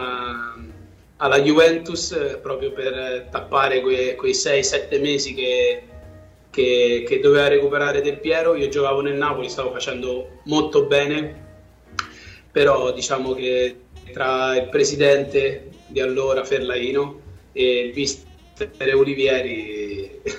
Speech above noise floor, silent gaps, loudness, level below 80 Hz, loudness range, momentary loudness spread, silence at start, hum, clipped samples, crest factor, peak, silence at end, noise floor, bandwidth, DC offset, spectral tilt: 26 dB; none; -20 LUFS; -50 dBFS; 4 LU; 13 LU; 0 s; none; under 0.1%; 16 dB; -4 dBFS; 0 s; -46 dBFS; 8.8 kHz; under 0.1%; -3.5 dB/octave